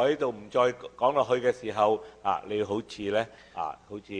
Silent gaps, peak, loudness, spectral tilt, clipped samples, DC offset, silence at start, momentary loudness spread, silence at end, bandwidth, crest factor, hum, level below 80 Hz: none; -10 dBFS; -29 LUFS; -5.5 dB/octave; under 0.1%; under 0.1%; 0 s; 10 LU; 0 s; 10 kHz; 18 dB; none; -64 dBFS